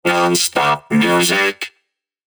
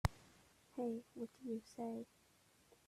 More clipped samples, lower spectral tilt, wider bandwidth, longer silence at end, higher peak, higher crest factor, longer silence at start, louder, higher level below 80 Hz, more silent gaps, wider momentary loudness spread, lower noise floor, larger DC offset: neither; second, -3 dB/octave vs -6.5 dB/octave; first, over 20 kHz vs 15 kHz; second, 0.65 s vs 0.85 s; first, -2 dBFS vs -18 dBFS; second, 14 dB vs 30 dB; about the same, 0.05 s vs 0.05 s; first, -15 LUFS vs -48 LUFS; about the same, -58 dBFS vs -58 dBFS; neither; second, 9 LU vs 20 LU; about the same, -69 dBFS vs -72 dBFS; neither